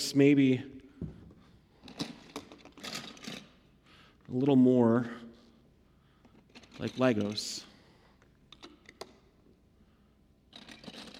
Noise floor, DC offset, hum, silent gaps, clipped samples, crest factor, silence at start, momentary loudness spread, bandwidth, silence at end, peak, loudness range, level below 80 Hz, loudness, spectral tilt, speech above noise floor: -65 dBFS; under 0.1%; none; none; under 0.1%; 22 dB; 0 s; 28 LU; 15 kHz; 0 s; -12 dBFS; 15 LU; -66 dBFS; -29 LUFS; -6 dB/octave; 38 dB